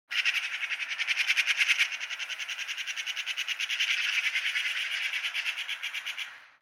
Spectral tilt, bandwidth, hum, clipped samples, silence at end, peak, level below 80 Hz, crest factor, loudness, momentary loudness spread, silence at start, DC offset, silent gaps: 5 dB/octave; 16.5 kHz; none; under 0.1%; 0.15 s; -10 dBFS; under -90 dBFS; 20 dB; -28 LUFS; 9 LU; 0.1 s; under 0.1%; none